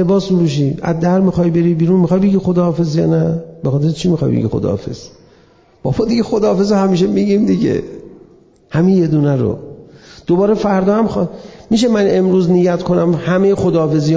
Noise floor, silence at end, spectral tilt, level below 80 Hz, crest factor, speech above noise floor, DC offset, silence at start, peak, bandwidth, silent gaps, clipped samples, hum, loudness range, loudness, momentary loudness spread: -48 dBFS; 0 s; -8 dB/octave; -42 dBFS; 10 dB; 35 dB; under 0.1%; 0 s; -4 dBFS; 7.8 kHz; none; under 0.1%; none; 3 LU; -14 LUFS; 8 LU